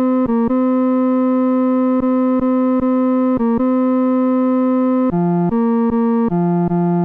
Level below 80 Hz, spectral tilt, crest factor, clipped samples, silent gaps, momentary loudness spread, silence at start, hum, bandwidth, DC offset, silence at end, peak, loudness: -46 dBFS; -12 dB/octave; 6 dB; under 0.1%; none; 1 LU; 0 s; none; 3.4 kHz; under 0.1%; 0 s; -8 dBFS; -16 LUFS